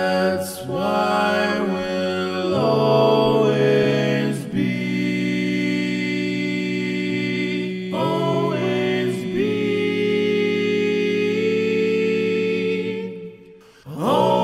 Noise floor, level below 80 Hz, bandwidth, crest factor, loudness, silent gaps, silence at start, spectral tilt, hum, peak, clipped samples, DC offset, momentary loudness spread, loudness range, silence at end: -46 dBFS; -58 dBFS; 15.5 kHz; 16 dB; -21 LUFS; none; 0 s; -6 dB/octave; none; -4 dBFS; under 0.1%; under 0.1%; 7 LU; 4 LU; 0 s